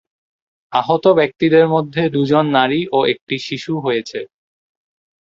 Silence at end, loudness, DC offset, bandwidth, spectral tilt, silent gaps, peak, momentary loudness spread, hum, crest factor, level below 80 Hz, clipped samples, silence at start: 0.95 s; -16 LUFS; under 0.1%; 7.6 kHz; -6.5 dB/octave; 3.21-3.27 s; -2 dBFS; 9 LU; none; 16 dB; -58 dBFS; under 0.1%; 0.7 s